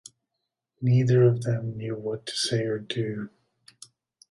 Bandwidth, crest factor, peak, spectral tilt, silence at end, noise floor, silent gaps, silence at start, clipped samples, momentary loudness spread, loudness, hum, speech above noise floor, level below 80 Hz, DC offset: 11.5 kHz; 16 dB; -10 dBFS; -6 dB/octave; 1.05 s; -83 dBFS; none; 0.8 s; under 0.1%; 12 LU; -26 LUFS; none; 59 dB; -64 dBFS; under 0.1%